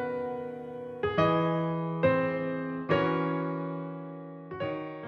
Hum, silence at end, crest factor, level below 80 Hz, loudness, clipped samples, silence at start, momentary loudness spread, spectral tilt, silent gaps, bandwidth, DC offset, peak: none; 0 s; 18 dB; -62 dBFS; -30 LUFS; under 0.1%; 0 s; 14 LU; -9 dB/octave; none; 6.2 kHz; under 0.1%; -12 dBFS